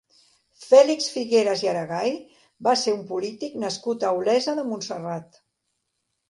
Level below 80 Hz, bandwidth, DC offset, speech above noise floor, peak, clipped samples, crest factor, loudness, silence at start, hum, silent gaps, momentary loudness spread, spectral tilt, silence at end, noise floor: -74 dBFS; 11.5 kHz; under 0.1%; 55 dB; -2 dBFS; under 0.1%; 20 dB; -23 LUFS; 0.6 s; none; none; 14 LU; -4 dB/octave; 1.05 s; -77 dBFS